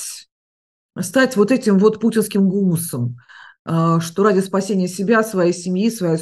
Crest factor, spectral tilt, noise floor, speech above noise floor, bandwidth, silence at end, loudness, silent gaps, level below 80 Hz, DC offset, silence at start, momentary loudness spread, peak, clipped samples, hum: 16 dB; -6 dB/octave; under -90 dBFS; over 73 dB; 12.5 kHz; 0 s; -18 LUFS; 0.32-0.89 s, 3.59-3.65 s; -64 dBFS; under 0.1%; 0 s; 13 LU; -2 dBFS; under 0.1%; none